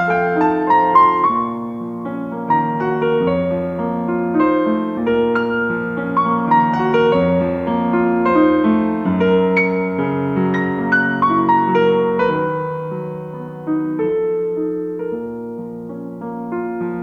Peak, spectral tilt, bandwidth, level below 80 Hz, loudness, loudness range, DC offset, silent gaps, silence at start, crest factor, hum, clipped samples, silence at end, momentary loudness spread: -2 dBFS; -9 dB/octave; 6.6 kHz; -50 dBFS; -17 LUFS; 7 LU; under 0.1%; none; 0 s; 16 dB; none; under 0.1%; 0 s; 12 LU